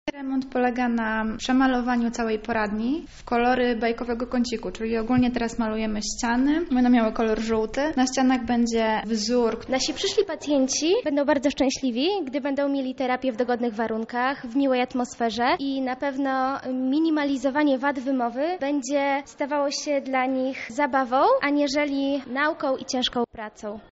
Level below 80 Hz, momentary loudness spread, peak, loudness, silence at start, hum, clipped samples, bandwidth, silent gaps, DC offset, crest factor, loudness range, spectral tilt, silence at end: -48 dBFS; 6 LU; -8 dBFS; -24 LUFS; 0.05 s; none; under 0.1%; 8 kHz; none; under 0.1%; 16 dB; 2 LU; -2.5 dB/octave; 0.05 s